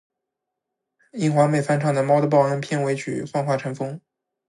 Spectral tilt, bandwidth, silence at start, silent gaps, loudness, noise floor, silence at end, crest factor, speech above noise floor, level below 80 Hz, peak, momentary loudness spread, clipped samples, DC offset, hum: -7 dB/octave; 11.5 kHz; 1.15 s; none; -22 LUFS; -83 dBFS; 0.5 s; 18 dB; 62 dB; -68 dBFS; -4 dBFS; 12 LU; under 0.1%; under 0.1%; none